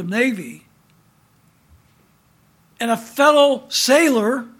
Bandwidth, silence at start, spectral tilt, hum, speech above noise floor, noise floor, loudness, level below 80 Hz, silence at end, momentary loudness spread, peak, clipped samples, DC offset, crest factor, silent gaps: 18.5 kHz; 0 s; -3 dB/octave; none; 40 dB; -57 dBFS; -16 LUFS; -66 dBFS; 0.1 s; 13 LU; -2 dBFS; under 0.1%; under 0.1%; 18 dB; none